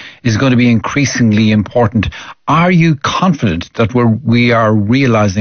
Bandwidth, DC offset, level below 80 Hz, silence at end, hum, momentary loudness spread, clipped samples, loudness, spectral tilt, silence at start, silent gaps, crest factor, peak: 6.6 kHz; under 0.1%; -38 dBFS; 0 s; none; 6 LU; under 0.1%; -12 LUFS; -6.5 dB/octave; 0 s; none; 10 dB; -2 dBFS